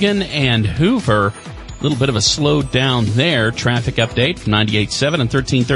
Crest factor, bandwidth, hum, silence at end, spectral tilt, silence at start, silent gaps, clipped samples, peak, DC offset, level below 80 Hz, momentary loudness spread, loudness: 14 dB; 11.5 kHz; none; 0 s; -5 dB/octave; 0 s; none; under 0.1%; -2 dBFS; under 0.1%; -36 dBFS; 3 LU; -16 LUFS